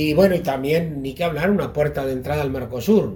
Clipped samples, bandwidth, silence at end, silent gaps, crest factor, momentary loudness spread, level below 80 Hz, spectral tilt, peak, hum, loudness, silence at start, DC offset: under 0.1%; 18 kHz; 0 s; none; 18 dB; 8 LU; -42 dBFS; -7 dB/octave; -2 dBFS; none; -21 LUFS; 0 s; under 0.1%